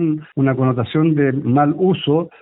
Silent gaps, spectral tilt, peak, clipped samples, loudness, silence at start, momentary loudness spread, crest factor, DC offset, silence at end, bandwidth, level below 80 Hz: none; -13 dB/octave; -4 dBFS; under 0.1%; -17 LUFS; 0 s; 4 LU; 12 dB; under 0.1%; 0.15 s; 4.1 kHz; -56 dBFS